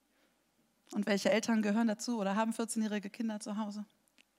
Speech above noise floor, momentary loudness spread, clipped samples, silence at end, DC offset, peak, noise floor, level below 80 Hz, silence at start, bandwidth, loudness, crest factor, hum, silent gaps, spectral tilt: 41 dB; 11 LU; under 0.1%; 0.55 s; under 0.1%; -18 dBFS; -75 dBFS; -90 dBFS; 0.9 s; 15.5 kHz; -34 LUFS; 18 dB; none; none; -4.5 dB/octave